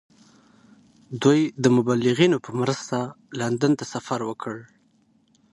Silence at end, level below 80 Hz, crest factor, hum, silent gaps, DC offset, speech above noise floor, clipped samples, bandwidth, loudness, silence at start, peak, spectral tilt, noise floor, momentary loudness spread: 0.9 s; -64 dBFS; 20 dB; none; none; under 0.1%; 40 dB; under 0.1%; 11.5 kHz; -23 LUFS; 1.1 s; -4 dBFS; -6 dB/octave; -62 dBFS; 14 LU